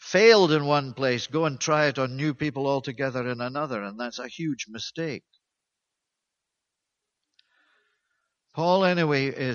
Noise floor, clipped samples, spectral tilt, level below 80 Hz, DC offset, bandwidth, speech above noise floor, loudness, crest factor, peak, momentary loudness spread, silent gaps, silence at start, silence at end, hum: -84 dBFS; under 0.1%; -5 dB/octave; -68 dBFS; under 0.1%; 7.2 kHz; 60 dB; -25 LUFS; 22 dB; -4 dBFS; 14 LU; none; 0 s; 0 s; none